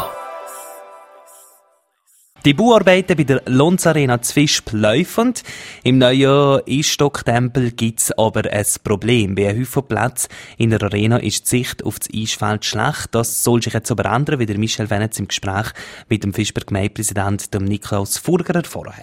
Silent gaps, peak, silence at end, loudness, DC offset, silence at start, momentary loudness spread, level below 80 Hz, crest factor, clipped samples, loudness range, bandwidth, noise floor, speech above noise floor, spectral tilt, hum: none; 0 dBFS; 0 s; -17 LUFS; under 0.1%; 0 s; 10 LU; -46 dBFS; 18 dB; under 0.1%; 5 LU; 16.5 kHz; -59 dBFS; 43 dB; -4.5 dB/octave; none